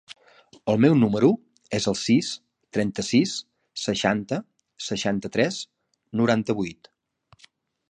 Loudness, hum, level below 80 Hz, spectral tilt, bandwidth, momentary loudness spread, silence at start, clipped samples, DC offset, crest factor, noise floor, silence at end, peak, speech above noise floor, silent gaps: -24 LUFS; none; -60 dBFS; -5 dB/octave; 10 kHz; 15 LU; 0.1 s; under 0.1%; under 0.1%; 20 dB; -60 dBFS; 1.2 s; -4 dBFS; 38 dB; none